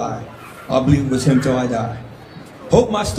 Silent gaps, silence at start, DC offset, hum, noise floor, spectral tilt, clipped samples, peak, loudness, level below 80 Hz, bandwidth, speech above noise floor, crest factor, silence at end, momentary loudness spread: none; 0 s; under 0.1%; none; -37 dBFS; -6.5 dB/octave; under 0.1%; 0 dBFS; -17 LUFS; -38 dBFS; 14.5 kHz; 21 dB; 18 dB; 0 s; 21 LU